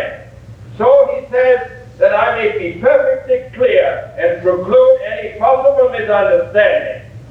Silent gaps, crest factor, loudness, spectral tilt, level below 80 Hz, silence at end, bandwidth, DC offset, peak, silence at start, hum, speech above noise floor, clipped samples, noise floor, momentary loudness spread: none; 14 dB; -13 LUFS; -6.5 dB/octave; -46 dBFS; 0 s; 4.3 kHz; under 0.1%; 0 dBFS; 0 s; none; 22 dB; under 0.1%; -35 dBFS; 8 LU